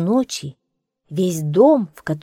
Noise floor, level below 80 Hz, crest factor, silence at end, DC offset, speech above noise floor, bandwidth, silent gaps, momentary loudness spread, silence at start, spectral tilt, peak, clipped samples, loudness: -72 dBFS; -60 dBFS; 16 dB; 0.05 s; under 0.1%; 54 dB; 16.5 kHz; none; 15 LU; 0 s; -6.5 dB/octave; -2 dBFS; under 0.1%; -18 LUFS